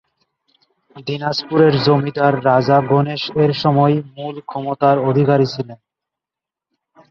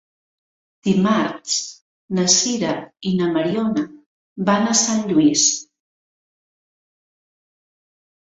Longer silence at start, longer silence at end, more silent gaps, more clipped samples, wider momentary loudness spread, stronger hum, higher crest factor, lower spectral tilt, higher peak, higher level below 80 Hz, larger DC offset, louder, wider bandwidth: about the same, 0.95 s vs 0.85 s; second, 1.35 s vs 2.75 s; second, none vs 1.81-2.08 s, 4.06-4.36 s; neither; about the same, 13 LU vs 11 LU; neither; about the same, 16 dB vs 20 dB; first, -8 dB/octave vs -3.5 dB/octave; about the same, 0 dBFS vs -2 dBFS; first, -56 dBFS vs -62 dBFS; neither; about the same, -16 LUFS vs -18 LUFS; second, 6.8 kHz vs 8.2 kHz